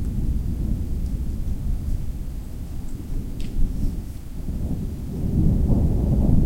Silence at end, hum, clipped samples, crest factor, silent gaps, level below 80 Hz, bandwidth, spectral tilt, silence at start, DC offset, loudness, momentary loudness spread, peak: 0 s; none; under 0.1%; 18 dB; none; -24 dBFS; 16 kHz; -9 dB/octave; 0 s; under 0.1%; -27 LUFS; 13 LU; -4 dBFS